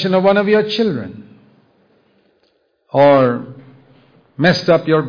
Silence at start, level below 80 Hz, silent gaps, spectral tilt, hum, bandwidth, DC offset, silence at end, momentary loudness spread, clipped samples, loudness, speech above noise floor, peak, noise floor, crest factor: 0 s; -56 dBFS; none; -7 dB/octave; none; 5.2 kHz; under 0.1%; 0 s; 15 LU; under 0.1%; -14 LUFS; 48 dB; -2 dBFS; -61 dBFS; 14 dB